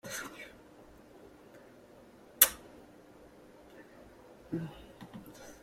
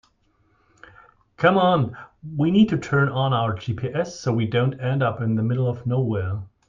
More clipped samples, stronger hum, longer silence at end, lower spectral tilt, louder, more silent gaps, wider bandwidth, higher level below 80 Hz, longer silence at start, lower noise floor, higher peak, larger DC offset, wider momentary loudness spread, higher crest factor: neither; neither; second, 0.05 s vs 0.2 s; second, -1.5 dB/octave vs -7.5 dB/octave; second, -30 LUFS vs -22 LUFS; neither; first, 16.5 kHz vs 7.4 kHz; second, -66 dBFS vs -56 dBFS; second, 0.05 s vs 1.4 s; second, -57 dBFS vs -64 dBFS; about the same, -2 dBFS vs -4 dBFS; neither; first, 31 LU vs 9 LU; first, 36 dB vs 20 dB